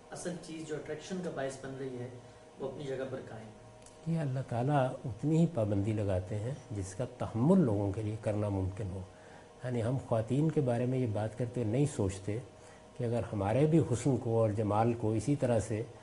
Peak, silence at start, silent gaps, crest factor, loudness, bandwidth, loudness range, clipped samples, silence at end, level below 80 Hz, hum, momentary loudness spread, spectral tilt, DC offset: -14 dBFS; 0.05 s; none; 18 dB; -33 LUFS; 11.5 kHz; 9 LU; under 0.1%; 0 s; -62 dBFS; none; 14 LU; -7.5 dB/octave; under 0.1%